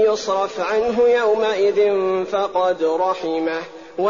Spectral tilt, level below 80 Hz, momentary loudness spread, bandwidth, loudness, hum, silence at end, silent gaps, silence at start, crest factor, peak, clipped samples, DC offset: -2.5 dB/octave; -58 dBFS; 6 LU; 7.2 kHz; -19 LUFS; none; 0 s; none; 0 s; 12 dB; -8 dBFS; under 0.1%; 0.2%